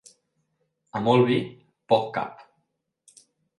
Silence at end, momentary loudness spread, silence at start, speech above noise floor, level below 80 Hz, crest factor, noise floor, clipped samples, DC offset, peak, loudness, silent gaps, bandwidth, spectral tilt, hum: 1.2 s; 16 LU; 0.95 s; 53 dB; -68 dBFS; 22 dB; -76 dBFS; under 0.1%; under 0.1%; -6 dBFS; -24 LUFS; none; 11.5 kHz; -7 dB/octave; none